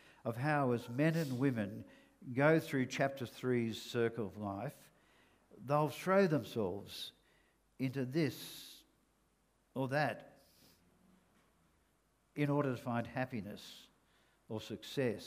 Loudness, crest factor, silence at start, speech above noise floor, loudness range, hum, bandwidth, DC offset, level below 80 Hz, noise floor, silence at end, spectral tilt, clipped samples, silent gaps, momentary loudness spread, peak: -37 LUFS; 22 dB; 0.25 s; 39 dB; 8 LU; none; 15.5 kHz; under 0.1%; -76 dBFS; -75 dBFS; 0 s; -6.5 dB/octave; under 0.1%; none; 17 LU; -16 dBFS